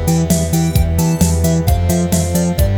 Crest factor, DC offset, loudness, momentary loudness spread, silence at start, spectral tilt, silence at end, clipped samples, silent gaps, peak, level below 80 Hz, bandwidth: 14 dB; under 0.1%; -15 LUFS; 1 LU; 0 s; -6 dB/octave; 0 s; under 0.1%; none; 0 dBFS; -22 dBFS; over 20 kHz